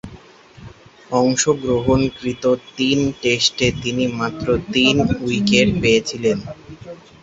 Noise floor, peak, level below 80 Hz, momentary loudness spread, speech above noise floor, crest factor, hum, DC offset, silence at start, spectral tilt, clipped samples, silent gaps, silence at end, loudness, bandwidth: -43 dBFS; 0 dBFS; -40 dBFS; 8 LU; 25 dB; 18 dB; none; under 0.1%; 0.05 s; -4.5 dB/octave; under 0.1%; none; 0.25 s; -18 LUFS; 8.2 kHz